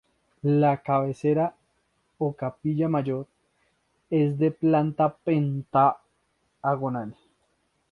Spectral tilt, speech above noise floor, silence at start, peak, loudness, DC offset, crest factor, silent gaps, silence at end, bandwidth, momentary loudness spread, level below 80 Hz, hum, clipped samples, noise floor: -10 dB/octave; 47 dB; 0.45 s; -8 dBFS; -25 LUFS; under 0.1%; 18 dB; none; 0.8 s; 6.8 kHz; 9 LU; -66 dBFS; none; under 0.1%; -71 dBFS